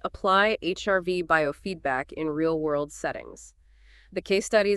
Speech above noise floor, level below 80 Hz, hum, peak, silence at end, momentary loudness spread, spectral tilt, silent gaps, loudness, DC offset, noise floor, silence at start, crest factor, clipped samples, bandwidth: 29 dB; -52 dBFS; none; -6 dBFS; 0 s; 12 LU; -4.5 dB/octave; none; -26 LUFS; under 0.1%; -55 dBFS; 0.05 s; 20 dB; under 0.1%; 12.5 kHz